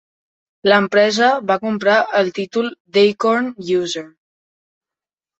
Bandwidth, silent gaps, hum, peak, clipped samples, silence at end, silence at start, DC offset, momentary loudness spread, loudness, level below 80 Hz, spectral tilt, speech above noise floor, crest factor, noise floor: 8.2 kHz; 2.80-2.85 s; none; -2 dBFS; under 0.1%; 1.3 s; 0.65 s; under 0.1%; 8 LU; -17 LUFS; -64 dBFS; -4.5 dB/octave; 74 dB; 16 dB; -90 dBFS